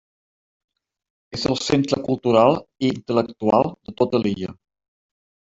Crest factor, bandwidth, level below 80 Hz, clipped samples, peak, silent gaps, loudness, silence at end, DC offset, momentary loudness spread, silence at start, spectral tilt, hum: 20 dB; 8 kHz; -56 dBFS; under 0.1%; -2 dBFS; none; -21 LUFS; 0.9 s; under 0.1%; 10 LU; 1.3 s; -6 dB/octave; none